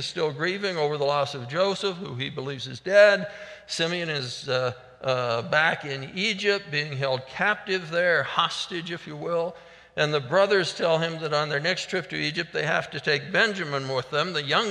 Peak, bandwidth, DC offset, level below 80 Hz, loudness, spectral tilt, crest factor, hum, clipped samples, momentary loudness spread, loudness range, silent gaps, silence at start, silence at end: -4 dBFS; 11 kHz; under 0.1%; -66 dBFS; -25 LUFS; -4 dB/octave; 22 dB; none; under 0.1%; 10 LU; 2 LU; none; 0 s; 0 s